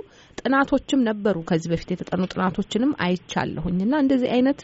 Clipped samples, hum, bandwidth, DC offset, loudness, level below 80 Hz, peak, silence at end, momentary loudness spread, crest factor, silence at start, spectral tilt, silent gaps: under 0.1%; none; 8 kHz; under 0.1%; -23 LUFS; -48 dBFS; -8 dBFS; 0 s; 7 LU; 14 dB; 0.4 s; -5.5 dB/octave; none